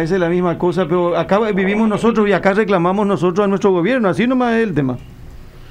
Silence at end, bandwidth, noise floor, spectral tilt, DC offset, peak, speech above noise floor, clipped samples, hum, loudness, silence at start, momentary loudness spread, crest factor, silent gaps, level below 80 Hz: 0 s; 10.5 kHz; -35 dBFS; -7.5 dB/octave; under 0.1%; 0 dBFS; 20 dB; under 0.1%; none; -15 LUFS; 0 s; 3 LU; 14 dB; none; -42 dBFS